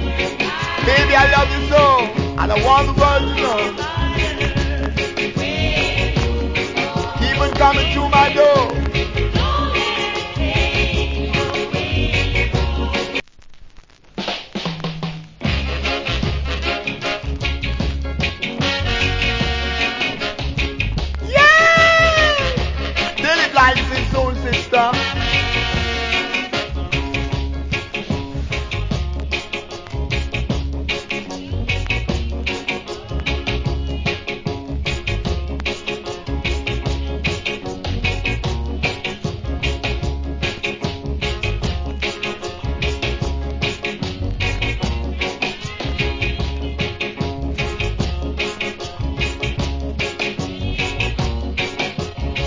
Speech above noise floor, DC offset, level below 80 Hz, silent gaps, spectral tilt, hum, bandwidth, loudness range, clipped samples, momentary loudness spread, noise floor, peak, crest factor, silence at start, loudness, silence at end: 29 dB; under 0.1%; -26 dBFS; none; -5 dB/octave; none; 7.6 kHz; 9 LU; under 0.1%; 11 LU; -43 dBFS; 0 dBFS; 20 dB; 0 s; -19 LUFS; 0 s